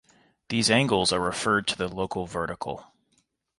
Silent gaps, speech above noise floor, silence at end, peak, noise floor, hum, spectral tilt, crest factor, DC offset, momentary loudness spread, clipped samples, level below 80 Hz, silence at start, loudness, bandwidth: none; 45 dB; 0.75 s; -6 dBFS; -71 dBFS; none; -3.5 dB/octave; 20 dB; under 0.1%; 12 LU; under 0.1%; -54 dBFS; 0.5 s; -25 LUFS; 11.5 kHz